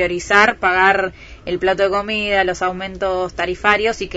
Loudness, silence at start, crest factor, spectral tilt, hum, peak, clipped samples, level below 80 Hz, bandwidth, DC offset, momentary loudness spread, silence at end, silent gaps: -17 LUFS; 0 s; 18 dB; -4 dB/octave; none; 0 dBFS; under 0.1%; -40 dBFS; 8 kHz; under 0.1%; 10 LU; 0 s; none